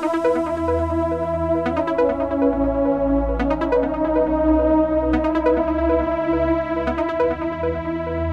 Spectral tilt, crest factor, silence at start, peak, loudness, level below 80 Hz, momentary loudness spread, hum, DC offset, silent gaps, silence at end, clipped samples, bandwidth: -8.5 dB/octave; 14 dB; 0 s; -6 dBFS; -20 LUFS; -32 dBFS; 5 LU; none; 0.2%; none; 0 s; under 0.1%; 9 kHz